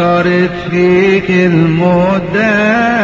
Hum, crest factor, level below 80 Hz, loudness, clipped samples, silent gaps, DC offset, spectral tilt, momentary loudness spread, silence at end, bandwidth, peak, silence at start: none; 10 dB; -38 dBFS; -10 LUFS; under 0.1%; none; under 0.1%; -7.5 dB/octave; 3 LU; 0 s; 7.6 kHz; 0 dBFS; 0 s